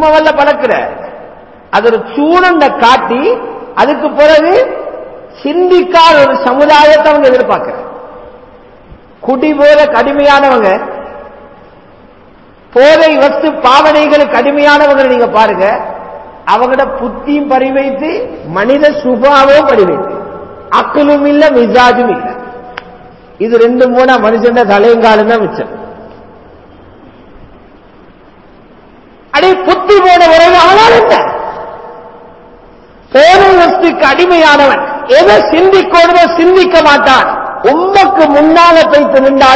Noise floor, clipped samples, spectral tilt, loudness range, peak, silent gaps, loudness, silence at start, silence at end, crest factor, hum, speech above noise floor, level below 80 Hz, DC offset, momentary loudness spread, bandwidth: -38 dBFS; 5%; -4.5 dB/octave; 5 LU; 0 dBFS; none; -6 LUFS; 0 s; 0 s; 8 dB; none; 32 dB; -40 dBFS; 0.4%; 16 LU; 8 kHz